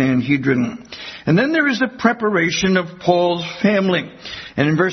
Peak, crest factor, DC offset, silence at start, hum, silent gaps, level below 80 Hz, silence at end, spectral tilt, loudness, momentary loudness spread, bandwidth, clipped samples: 0 dBFS; 16 dB; under 0.1%; 0 s; none; none; -52 dBFS; 0 s; -5.5 dB/octave; -18 LUFS; 11 LU; 6.4 kHz; under 0.1%